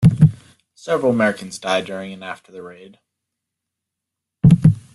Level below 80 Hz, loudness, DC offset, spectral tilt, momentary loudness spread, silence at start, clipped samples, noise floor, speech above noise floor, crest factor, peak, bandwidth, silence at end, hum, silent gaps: -44 dBFS; -17 LUFS; under 0.1%; -7.5 dB/octave; 24 LU; 0 s; under 0.1%; -82 dBFS; 60 dB; 18 dB; -2 dBFS; 11.5 kHz; 0.15 s; none; none